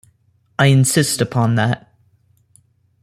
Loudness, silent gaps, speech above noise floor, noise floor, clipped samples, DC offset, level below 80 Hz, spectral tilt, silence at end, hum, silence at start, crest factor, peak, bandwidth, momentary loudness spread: -16 LUFS; none; 44 dB; -59 dBFS; under 0.1%; under 0.1%; -54 dBFS; -5 dB/octave; 1.25 s; none; 0.6 s; 16 dB; -2 dBFS; 16 kHz; 11 LU